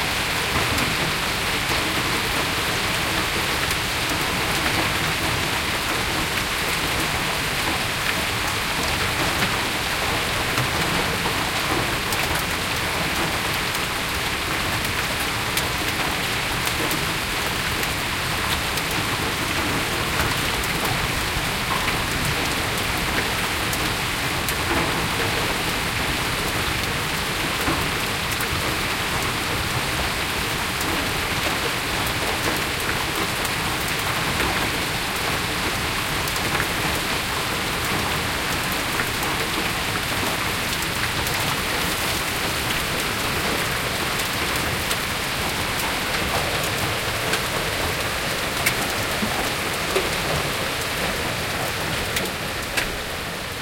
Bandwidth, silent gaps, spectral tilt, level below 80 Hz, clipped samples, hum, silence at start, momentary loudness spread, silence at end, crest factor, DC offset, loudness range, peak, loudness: 17 kHz; none; -2.5 dB/octave; -38 dBFS; under 0.1%; none; 0 s; 2 LU; 0 s; 20 dB; under 0.1%; 1 LU; -4 dBFS; -22 LUFS